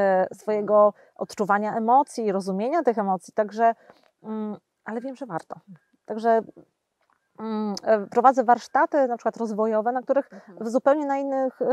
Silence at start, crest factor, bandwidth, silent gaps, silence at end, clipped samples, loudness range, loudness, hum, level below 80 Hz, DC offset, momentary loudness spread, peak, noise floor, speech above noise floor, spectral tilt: 0 s; 20 dB; 12 kHz; none; 0 s; under 0.1%; 8 LU; -23 LUFS; none; -80 dBFS; under 0.1%; 16 LU; -2 dBFS; -70 dBFS; 47 dB; -6 dB/octave